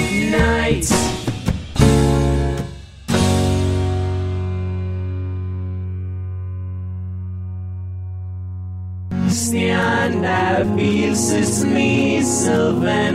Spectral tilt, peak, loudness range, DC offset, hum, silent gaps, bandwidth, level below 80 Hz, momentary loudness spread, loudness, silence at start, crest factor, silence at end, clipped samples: -5 dB/octave; 0 dBFS; 10 LU; under 0.1%; none; none; 15.5 kHz; -30 dBFS; 13 LU; -19 LUFS; 0 s; 18 dB; 0 s; under 0.1%